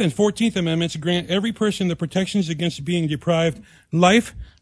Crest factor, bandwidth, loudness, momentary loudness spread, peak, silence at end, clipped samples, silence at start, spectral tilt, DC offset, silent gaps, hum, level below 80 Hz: 18 dB; 11 kHz; -21 LUFS; 8 LU; -2 dBFS; 0.15 s; under 0.1%; 0 s; -5.5 dB/octave; under 0.1%; none; none; -48 dBFS